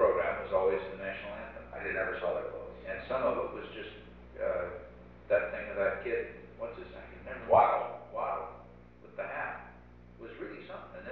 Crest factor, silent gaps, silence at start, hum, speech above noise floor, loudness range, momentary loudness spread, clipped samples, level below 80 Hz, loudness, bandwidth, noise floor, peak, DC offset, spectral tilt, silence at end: 22 dB; none; 0 s; 60 Hz at -55 dBFS; 21 dB; 5 LU; 18 LU; under 0.1%; -56 dBFS; -34 LUFS; 4.7 kHz; -54 dBFS; -12 dBFS; under 0.1%; -3.5 dB/octave; 0 s